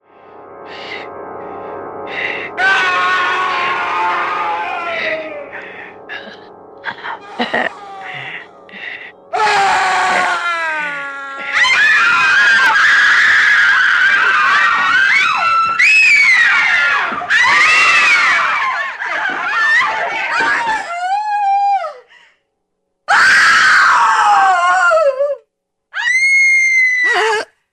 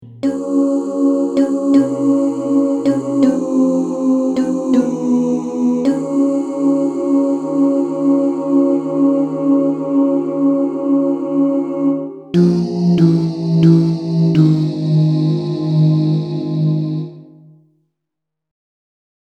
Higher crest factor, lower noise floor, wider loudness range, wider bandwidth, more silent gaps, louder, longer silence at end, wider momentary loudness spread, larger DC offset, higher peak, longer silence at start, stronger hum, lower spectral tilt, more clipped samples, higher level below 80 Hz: about the same, 14 dB vs 14 dB; second, -69 dBFS vs -80 dBFS; first, 12 LU vs 3 LU; first, 14.5 kHz vs 9 kHz; neither; first, -11 LUFS vs -15 LUFS; second, 0.3 s vs 2.15 s; first, 20 LU vs 4 LU; neither; about the same, 0 dBFS vs 0 dBFS; first, 0.35 s vs 0 s; neither; second, -0.5 dB/octave vs -9 dB/octave; neither; about the same, -60 dBFS vs -60 dBFS